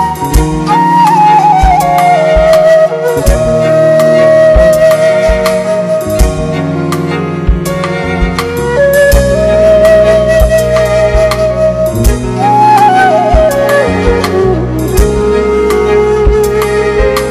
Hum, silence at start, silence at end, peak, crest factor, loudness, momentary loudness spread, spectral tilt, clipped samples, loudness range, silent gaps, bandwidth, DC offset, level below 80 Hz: none; 0 s; 0 s; 0 dBFS; 8 dB; -8 LUFS; 8 LU; -6 dB/octave; 1%; 4 LU; none; 15.5 kHz; under 0.1%; -16 dBFS